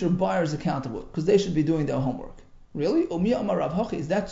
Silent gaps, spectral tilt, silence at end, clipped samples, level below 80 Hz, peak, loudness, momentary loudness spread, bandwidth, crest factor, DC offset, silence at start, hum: none; -7.5 dB/octave; 0 s; under 0.1%; -46 dBFS; -8 dBFS; -25 LUFS; 9 LU; 7.8 kHz; 16 dB; under 0.1%; 0 s; none